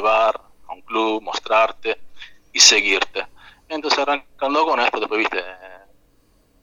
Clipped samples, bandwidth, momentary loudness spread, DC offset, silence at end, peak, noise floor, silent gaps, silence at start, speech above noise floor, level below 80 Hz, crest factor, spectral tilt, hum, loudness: under 0.1%; 16.5 kHz; 20 LU; under 0.1%; 0.85 s; 0 dBFS; -58 dBFS; none; 0 s; 39 dB; -58 dBFS; 20 dB; 0.5 dB/octave; none; -18 LUFS